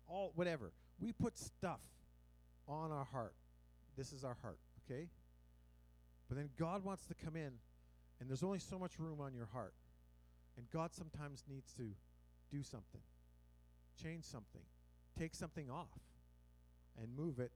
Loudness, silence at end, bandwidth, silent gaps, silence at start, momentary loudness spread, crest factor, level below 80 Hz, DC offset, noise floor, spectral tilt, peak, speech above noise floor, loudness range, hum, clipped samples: -49 LUFS; 0 s; 16 kHz; none; 0 s; 18 LU; 22 dB; -66 dBFS; under 0.1%; -68 dBFS; -6.5 dB/octave; -28 dBFS; 20 dB; 7 LU; 60 Hz at -65 dBFS; under 0.1%